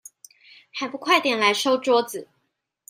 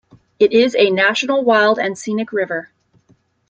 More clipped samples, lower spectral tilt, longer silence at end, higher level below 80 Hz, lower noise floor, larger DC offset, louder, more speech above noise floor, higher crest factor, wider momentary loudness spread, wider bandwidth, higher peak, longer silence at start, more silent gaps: neither; second, -2 dB/octave vs -4 dB/octave; second, 0.65 s vs 0.85 s; second, -78 dBFS vs -64 dBFS; first, -75 dBFS vs -57 dBFS; neither; second, -21 LUFS vs -16 LUFS; first, 53 dB vs 42 dB; about the same, 20 dB vs 16 dB; first, 15 LU vs 9 LU; first, 16 kHz vs 9 kHz; about the same, -4 dBFS vs -2 dBFS; first, 0.75 s vs 0.4 s; neither